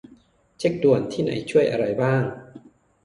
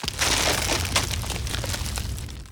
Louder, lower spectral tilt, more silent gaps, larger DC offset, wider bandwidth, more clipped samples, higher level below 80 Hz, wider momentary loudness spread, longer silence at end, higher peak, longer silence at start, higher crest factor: about the same, -22 LUFS vs -24 LUFS; first, -7 dB/octave vs -2.5 dB/octave; neither; neither; second, 11.5 kHz vs over 20 kHz; neither; second, -58 dBFS vs -34 dBFS; second, 7 LU vs 10 LU; first, 0.45 s vs 0 s; about the same, -6 dBFS vs -6 dBFS; first, 0.6 s vs 0 s; about the same, 18 dB vs 20 dB